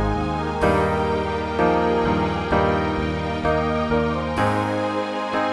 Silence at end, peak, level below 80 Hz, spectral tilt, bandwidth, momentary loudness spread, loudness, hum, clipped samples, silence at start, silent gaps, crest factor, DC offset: 0 s; -4 dBFS; -36 dBFS; -7 dB/octave; 12 kHz; 5 LU; -22 LUFS; none; under 0.1%; 0 s; none; 16 dB; under 0.1%